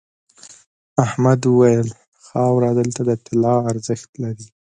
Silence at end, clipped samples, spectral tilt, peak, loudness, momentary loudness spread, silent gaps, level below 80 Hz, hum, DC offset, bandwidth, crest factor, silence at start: 0.3 s; under 0.1%; -7.5 dB/octave; 0 dBFS; -18 LUFS; 14 LU; 2.08-2.12 s, 4.09-4.13 s; -56 dBFS; none; under 0.1%; 9.6 kHz; 18 dB; 0.95 s